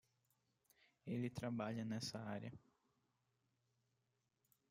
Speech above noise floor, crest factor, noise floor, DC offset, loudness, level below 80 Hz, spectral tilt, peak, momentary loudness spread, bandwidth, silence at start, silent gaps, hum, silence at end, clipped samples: 41 dB; 20 dB; -87 dBFS; under 0.1%; -47 LUFS; -82 dBFS; -5.5 dB/octave; -32 dBFS; 12 LU; 16 kHz; 1.05 s; none; none; 2.1 s; under 0.1%